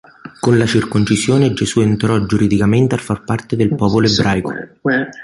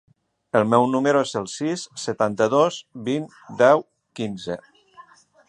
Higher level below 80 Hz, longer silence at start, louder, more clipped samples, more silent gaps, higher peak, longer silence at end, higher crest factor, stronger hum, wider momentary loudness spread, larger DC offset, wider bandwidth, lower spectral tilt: first, -40 dBFS vs -66 dBFS; second, 0.25 s vs 0.55 s; first, -15 LUFS vs -22 LUFS; neither; neither; about the same, -2 dBFS vs -2 dBFS; second, 0 s vs 0.45 s; second, 14 dB vs 20 dB; neither; second, 7 LU vs 14 LU; neither; about the same, 11.5 kHz vs 11.5 kHz; about the same, -6 dB/octave vs -5 dB/octave